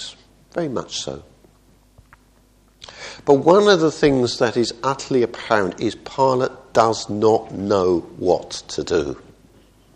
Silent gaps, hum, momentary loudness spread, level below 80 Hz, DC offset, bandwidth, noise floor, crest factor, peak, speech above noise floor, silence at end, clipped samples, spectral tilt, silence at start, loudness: none; none; 15 LU; -50 dBFS; under 0.1%; 10 kHz; -55 dBFS; 20 dB; 0 dBFS; 36 dB; 0.75 s; under 0.1%; -5 dB/octave; 0 s; -19 LUFS